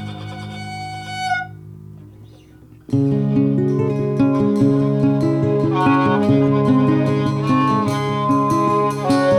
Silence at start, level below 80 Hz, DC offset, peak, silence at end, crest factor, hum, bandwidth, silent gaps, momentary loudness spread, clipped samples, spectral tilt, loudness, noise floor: 0 s; -50 dBFS; under 0.1%; -4 dBFS; 0 s; 14 dB; none; 11 kHz; none; 14 LU; under 0.1%; -8 dB/octave; -17 LUFS; -44 dBFS